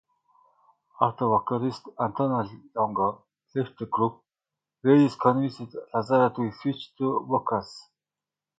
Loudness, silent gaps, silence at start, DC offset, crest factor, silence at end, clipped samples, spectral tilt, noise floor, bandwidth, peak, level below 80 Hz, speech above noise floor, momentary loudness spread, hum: -26 LUFS; none; 1 s; under 0.1%; 22 dB; 0.8 s; under 0.1%; -8.5 dB/octave; under -90 dBFS; 7.8 kHz; -4 dBFS; -66 dBFS; over 65 dB; 10 LU; 50 Hz at -60 dBFS